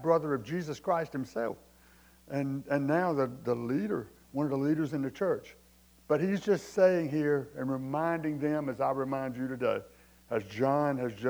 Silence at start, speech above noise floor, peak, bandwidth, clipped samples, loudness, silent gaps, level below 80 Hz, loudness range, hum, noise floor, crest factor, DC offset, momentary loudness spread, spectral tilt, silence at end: 0 s; 29 dB; -12 dBFS; over 20 kHz; under 0.1%; -31 LUFS; none; -66 dBFS; 3 LU; none; -59 dBFS; 18 dB; under 0.1%; 8 LU; -7.5 dB/octave; 0 s